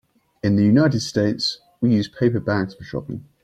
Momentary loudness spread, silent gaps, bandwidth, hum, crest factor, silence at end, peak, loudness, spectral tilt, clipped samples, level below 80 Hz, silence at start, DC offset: 14 LU; none; 10 kHz; none; 16 dB; 0.25 s; -6 dBFS; -20 LUFS; -6.5 dB/octave; under 0.1%; -54 dBFS; 0.45 s; under 0.1%